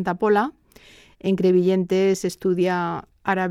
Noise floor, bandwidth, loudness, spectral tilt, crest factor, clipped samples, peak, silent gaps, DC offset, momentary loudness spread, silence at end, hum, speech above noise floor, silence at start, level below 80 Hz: -50 dBFS; 13.5 kHz; -22 LUFS; -6.5 dB/octave; 14 dB; under 0.1%; -8 dBFS; none; under 0.1%; 10 LU; 0 s; none; 30 dB; 0 s; -58 dBFS